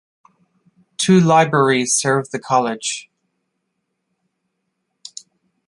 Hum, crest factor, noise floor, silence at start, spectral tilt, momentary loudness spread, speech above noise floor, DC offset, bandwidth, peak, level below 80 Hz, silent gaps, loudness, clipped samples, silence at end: none; 18 dB; -74 dBFS; 1 s; -4.5 dB/octave; 23 LU; 58 dB; under 0.1%; 11.5 kHz; -2 dBFS; -62 dBFS; none; -16 LUFS; under 0.1%; 2.65 s